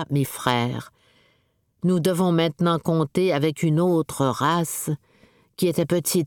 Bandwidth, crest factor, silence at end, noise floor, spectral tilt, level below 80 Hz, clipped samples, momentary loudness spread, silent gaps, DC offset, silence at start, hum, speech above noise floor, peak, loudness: 19 kHz; 18 dB; 0 s; -67 dBFS; -5.5 dB/octave; -60 dBFS; under 0.1%; 7 LU; none; under 0.1%; 0 s; none; 45 dB; -4 dBFS; -23 LUFS